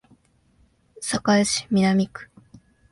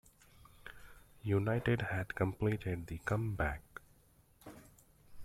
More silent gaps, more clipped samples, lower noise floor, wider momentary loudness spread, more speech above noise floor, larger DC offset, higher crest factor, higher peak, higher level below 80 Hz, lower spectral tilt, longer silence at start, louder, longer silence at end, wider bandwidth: neither; neither; second, -61 dBFS vs -67 dBFS; second, 12 LU vs 22 LU; first, 40 dB vs 32 dB; neither; about the same, 18 dB vs 20 dB; first, -6 dBFS vs -18 dBFS; about the same, -56 dBFS vs -54 dBFS; second, -4.5 dB/octave vs -7.5 dB/octave; first, 1 s vs 0.65 s; first, -22 LUFS vs -37 LUFS; first, 0.65 s vs 0 s; second, 11.5 kHz vs 15 kHz